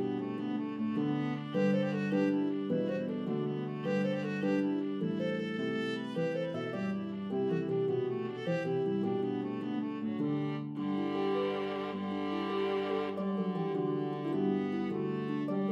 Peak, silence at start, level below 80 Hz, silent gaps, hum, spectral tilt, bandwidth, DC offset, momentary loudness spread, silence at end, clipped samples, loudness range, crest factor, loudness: -20 dBFS; 0 s; -82 dBFS; none; none; -8 dB/octave; 8 kHz; under 0.1%; 5 LU; 0 s; under 0.1%; 2 LU; 14 dB; -34 LUFS